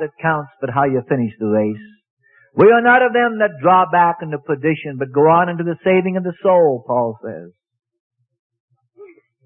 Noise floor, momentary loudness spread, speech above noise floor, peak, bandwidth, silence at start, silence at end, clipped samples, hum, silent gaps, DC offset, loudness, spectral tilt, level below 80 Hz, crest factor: -44 dBFS; 12 LU; 28 dB; 0 dBFS; 3.9 kHz; 0 s; 0.4 s; under 0.1%; none; 2.10-2.17 s, 8.00-8.10 s, 8.39-8.50 s, 8.60-8.68 s; under 0.1%; -16 LUFS; -11 dB/octave; -60 dBFS; 16 dB